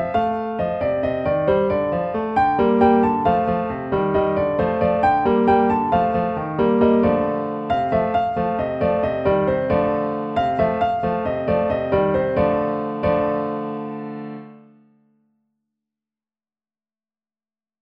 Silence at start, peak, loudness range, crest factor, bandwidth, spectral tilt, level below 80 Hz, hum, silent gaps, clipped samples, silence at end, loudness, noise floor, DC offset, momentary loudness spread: 0 s; -4 dBFS; 8 LU; 18 dB; 5.4 kHz; -9.5 dB/octave; -44 dBFS; none; none; under 0.1%; 3.25 s; -20 LUFS; under -90 dBFS; under 0.1%; 7 LU